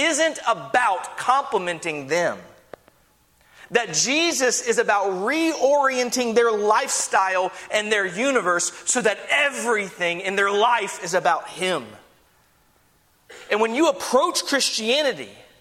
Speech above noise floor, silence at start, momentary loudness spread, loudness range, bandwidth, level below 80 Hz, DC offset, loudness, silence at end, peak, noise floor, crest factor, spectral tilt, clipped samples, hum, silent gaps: 39 dB; 0 s; 6 LU; 4 LU; 16 kHz; -68 dBFS; under 0.1%; -21 LUFS; 0.2 s; -4 dBFS; -60 dBFS; 18 dB; -1.5 dB/octave; under 0.1%; none; none